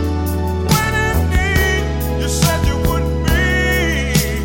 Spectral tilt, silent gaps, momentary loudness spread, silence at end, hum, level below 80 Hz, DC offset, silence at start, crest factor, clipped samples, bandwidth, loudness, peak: -5 dB/octave; none; 5 LU; 0 s; none; -20 dBFS; under 0.1%; 0 s; 14 dB; under 0.1%; 17 kHz; -16 LUFS; -2 dBFS